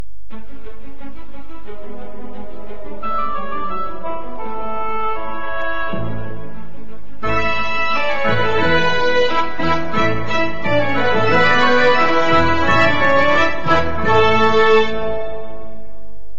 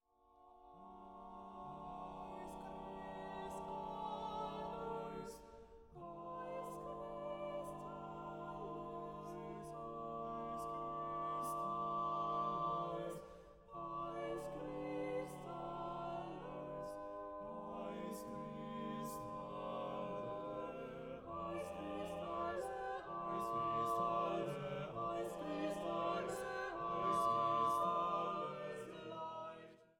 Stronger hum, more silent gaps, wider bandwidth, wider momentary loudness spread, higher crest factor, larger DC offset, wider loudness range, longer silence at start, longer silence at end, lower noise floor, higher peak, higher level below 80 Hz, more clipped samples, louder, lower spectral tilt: neither; neither; second, 8 kHz vs 17 kHz; first, 22 LU vs 12 LU; about the same, 14 dB vs 18 dB; first, 20% vs under 0.1%; first, 13 LU vs 9 LU; about the same, 0.3 s vs 0.35 s; about the same, 0.2 s vs 0.15 s; second, -42 dBFS vs -69 dBFS; first, -2 dBFS vs -26 dBFS; first, -38 dBFS vs -68 dBFS; neither; first, -17 LUFS vs -44 LUFS; about the same, -5.5 dB/octave vs -6 dB/octave